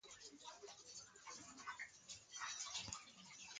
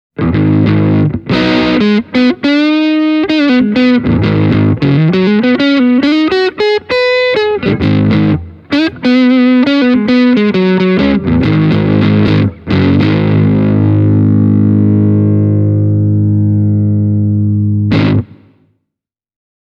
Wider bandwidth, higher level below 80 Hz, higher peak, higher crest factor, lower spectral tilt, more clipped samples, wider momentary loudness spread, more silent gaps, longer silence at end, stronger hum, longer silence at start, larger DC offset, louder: first, 9.6 kHz vs 6.6 kHz; second, -80 dBFS vs -36 dBFS; second, -30 dBFS vs 0 dBFS; first, 26 dB vs 10 dB; second, 0 dB/octave vs -8.5 dB/octave; neither; first, 10 LU vs 3 LU; neither; second, 0 s vs 1.5 s; neither; second, 0.05 s vs 0.2 s; neither; second, -52 LUFS vs -10 LUFS